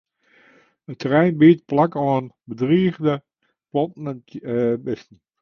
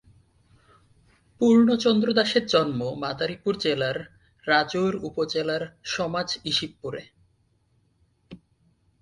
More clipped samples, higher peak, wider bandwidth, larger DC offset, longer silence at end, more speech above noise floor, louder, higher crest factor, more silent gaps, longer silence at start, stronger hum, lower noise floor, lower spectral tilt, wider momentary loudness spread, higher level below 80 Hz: neither; first, -2 dBFS vs -6 dBFS; second, 6.2 kHz vs 11 kHz; neither; second, 0.4 s vs 0.65 s; second, 37 dB vs 43 dB; first, -20 LUFS vs -24 LUFS; about the same, 18 dB vs 20 dB; neither; second, 0.9 s vs 1.4 s; neither; second, -56 dBFS vs -66 dBFS; first, -9 dB/octave vs -5 dB/octave; first, 18 LU vs 14 LU; about the same, -60 dBFS vs -62 dBFS